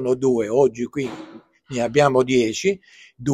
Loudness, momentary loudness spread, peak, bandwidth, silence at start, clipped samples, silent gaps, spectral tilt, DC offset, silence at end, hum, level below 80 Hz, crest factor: -20 LUFS; 14 LU; -2 dBFS; 11.5 kHz; 0 s; under 0.1%; none; -5.5 dB/octave; under 0.1%; 0 s; none; -56 dBFS; 18 dB